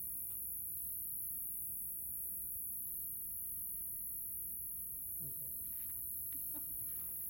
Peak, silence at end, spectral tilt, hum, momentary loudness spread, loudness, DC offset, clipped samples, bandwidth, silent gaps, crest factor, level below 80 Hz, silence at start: -36 dBFS; 0 s; -2.5 dB/octave; none; 1 LU; -40 LUFS; under 0.1%; under 0.1%; 17 kHz; none; 8 dB; -66 dBFS; 0 s